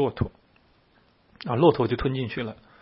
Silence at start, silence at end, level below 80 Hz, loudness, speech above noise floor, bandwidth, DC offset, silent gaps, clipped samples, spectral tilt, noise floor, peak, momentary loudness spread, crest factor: 0 s; 0.3 s; -48 dBFS; -25 LUFS; 38 dB; 5.8 kHz; under 0.1%; none; under 0.1%; -11.5 dB/octave; -62 dBFS; -4 dBFS; 14 LU; 22 dB